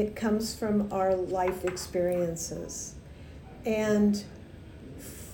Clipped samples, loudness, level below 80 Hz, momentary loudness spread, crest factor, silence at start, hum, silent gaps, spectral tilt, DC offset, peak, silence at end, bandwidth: under 0.1%; -29 LUFS; -50 dBFS; 21 LU; 16 dB; 0 s; none; none; -5.5 dB/octave; under 0.1%; -14 dBFS; 0 s; 19 kHz